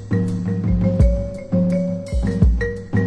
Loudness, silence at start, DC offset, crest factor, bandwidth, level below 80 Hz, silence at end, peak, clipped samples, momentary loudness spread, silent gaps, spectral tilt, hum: -20 LUFS; 0 s; under 0.1%; 16 dB; 9.8 kHz; -22 dBFS; 0 s; -2 dBFS; under 0.1%; 6 LU; none; -9 dB/octave; none